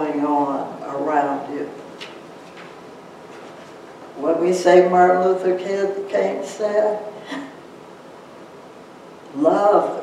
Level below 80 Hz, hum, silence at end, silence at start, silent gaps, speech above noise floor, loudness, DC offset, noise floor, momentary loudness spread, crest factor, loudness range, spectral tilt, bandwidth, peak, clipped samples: -72 dBFS; none; 0 s; 0 s; none; 24 dB; -19 LUFS; under 0.1%; -41 dBFS; 26 LU; 20 dB; 10 LU; -6 dB/octave; 11.5 kHz; -2 dBFS; under 0.1%